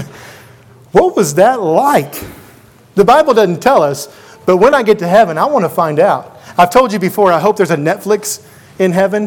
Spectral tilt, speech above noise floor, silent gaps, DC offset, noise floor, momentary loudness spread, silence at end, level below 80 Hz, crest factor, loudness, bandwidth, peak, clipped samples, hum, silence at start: -5 dB/octave; 31 dB; none; under 0.1%; -42 dBFS; 11 LU; 0 s; -46 dBFS; 12 dB; -11 LUFS; 19 kHz; 0 dBFS; 0.5%; none; 0 s